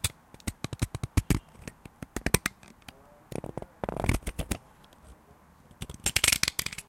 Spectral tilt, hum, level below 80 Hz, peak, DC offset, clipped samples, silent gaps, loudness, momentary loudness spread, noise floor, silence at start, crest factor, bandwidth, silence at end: -3 dB/octave; none; -42 dBFS; 0 dBFS; under 0.1%; under 0.1%; none; -30 LUFS; 23 LU; -57 dBFS; 0.05 s; 32 dB; 17 kHz; 0.05 s